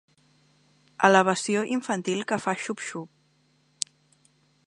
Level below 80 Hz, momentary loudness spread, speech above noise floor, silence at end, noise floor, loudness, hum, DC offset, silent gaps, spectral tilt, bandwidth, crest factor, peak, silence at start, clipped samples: -76 dBFS; 15 LU; 41 dB; 1.6 s; -66 dBFS; -25 LUFS; none; under 0.1%; none; -4 dB/octave; 11.5 kHz; 28 dB; 0 dBFS; 1 s; under 0.1%